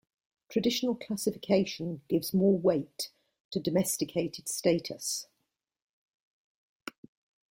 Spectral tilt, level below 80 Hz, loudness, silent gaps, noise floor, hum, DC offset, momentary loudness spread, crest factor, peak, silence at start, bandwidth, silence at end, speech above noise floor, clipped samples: -4.5 dB/octave; -70 dBFS; -30 LUFS; 3.40-3.51 s; -83 dBFS; none; under 0.1%; 12 LU; 20 dB; -12 dBFS; 0.5 s; 16.5 kHz; 2.3 s; 53 dB; under 0.1%